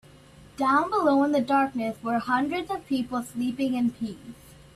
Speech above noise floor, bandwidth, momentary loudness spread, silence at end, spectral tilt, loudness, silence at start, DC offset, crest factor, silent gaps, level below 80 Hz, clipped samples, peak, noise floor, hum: 25 dB; 14 kHz; 10 LU; 0.25 s; -5.5 dB/octave; -26 LUFS; 0.4 s; under 0.1%; 18 dB; none; -60 dBFS; under 0.1%; -10 dBFS; -51 dBFS; none